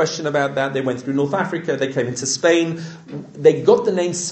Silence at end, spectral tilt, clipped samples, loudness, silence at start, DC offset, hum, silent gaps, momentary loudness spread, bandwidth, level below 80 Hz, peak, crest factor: 0 s; -4.5 dB/octave; under 0.1%; -19 LUFS; 0 s; under 0.1%; none; none; 10 LU; 8.8 kHz; -66 dBFS; -2 dBFS; 18 dB